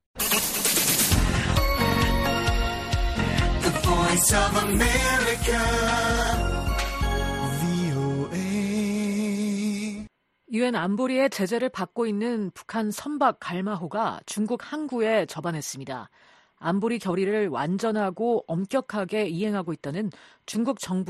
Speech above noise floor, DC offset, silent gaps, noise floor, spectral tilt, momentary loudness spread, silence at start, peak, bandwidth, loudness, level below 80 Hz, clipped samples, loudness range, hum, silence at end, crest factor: 22 dB; under 0.1%; none; -47 dBFS; -4 dB/octave; 10 LU; 0.15 s; -8 dBFS; 15 kHz; -25 LUFS; -34 dBFS; under 0.1%; 6 LU; none; 0 s; 18 dB